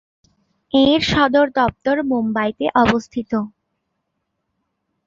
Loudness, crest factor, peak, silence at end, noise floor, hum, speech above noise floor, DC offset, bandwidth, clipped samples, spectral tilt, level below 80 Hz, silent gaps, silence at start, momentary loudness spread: -18 LUFS; 20 dB; 0 dBFS; 1.6 s; -74 dBFS; none; 57 dB; under 0.1%; 7.6 kHz; under 0.1%; -5.5 dB/octave; -46 dBFS; none; 0.75 s; 9 LU